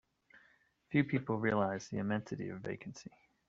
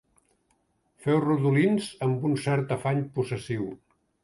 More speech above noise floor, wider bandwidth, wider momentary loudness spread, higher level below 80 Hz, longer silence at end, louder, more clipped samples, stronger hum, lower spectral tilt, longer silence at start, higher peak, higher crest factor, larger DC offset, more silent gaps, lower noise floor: second, 34 dB vs 45 dB; second, 7.8 kHz vs 11.5 kHz; first, 15 LU vs 10 LU; second, -70 dBFS vs -64 dBFS; about the same, 0.4 s vs 0.45 s; second, -36 LUFS vs -27 LUFS; neither; neither; about the same, -6.5 dB/octave vs -7.5 dB/octave; second, 0.35 s vs 1.05 s; second, -16 dBFS vs -12 dBFS; first, 22 dB vs 16 dB; neither; neither; about the same, -70 dBFS vs -71 dBFS